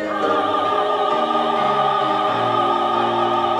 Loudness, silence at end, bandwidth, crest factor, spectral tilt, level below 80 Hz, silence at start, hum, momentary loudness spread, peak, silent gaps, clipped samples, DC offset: -18 LUFS; 0 s; 11.5 kHz; 12 dB; -5 dB/octave; -64 dBFS; 0 s; none; 1 LU; -6 dBFS; none; under 0.1%; under 0.1%